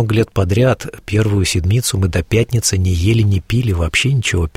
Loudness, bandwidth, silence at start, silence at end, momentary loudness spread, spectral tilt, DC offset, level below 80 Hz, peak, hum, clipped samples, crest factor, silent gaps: -16 LUFS; 16 kHz; 0 s; 0.05 s; 3 LU; -5 dB/octave; under 0.1%; -30 dBFS; -2 dBFS; none; under 0.1%; 14 dB; none